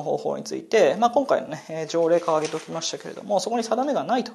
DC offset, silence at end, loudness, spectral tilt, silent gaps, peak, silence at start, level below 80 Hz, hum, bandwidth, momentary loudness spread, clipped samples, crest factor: under 0.1%; 0 s; -24 LUFS; -4 dB/octave; none; -6 dBFS; 0 s; -76 dBFS; none; 12.5 kHz; 10 LU; under 0.1%; 18 dB